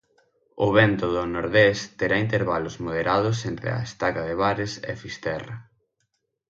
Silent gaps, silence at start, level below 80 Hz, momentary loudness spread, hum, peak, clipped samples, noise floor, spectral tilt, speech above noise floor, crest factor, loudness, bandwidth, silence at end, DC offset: none; 0.55 s; -50 dBFS; 12 LU; none; -4 dBFS; under 0.1%; -75 dBFS; -6 dB/octave; 51 dB; 20 dB; -24 LUFS; 7.8 kHz; 0.9 s; under 0.1%